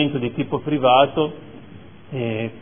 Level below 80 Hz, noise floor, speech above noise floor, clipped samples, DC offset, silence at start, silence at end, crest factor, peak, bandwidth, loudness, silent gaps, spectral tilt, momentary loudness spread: -56 dBFS; -43 dBFS; 23 dB; under 0.1%; 0.5%; 0 s; 0 s; 20 dB; -2 dBFS; 3.6 kHz; -20 LUFS; none; -10 dB/octave; 18 LU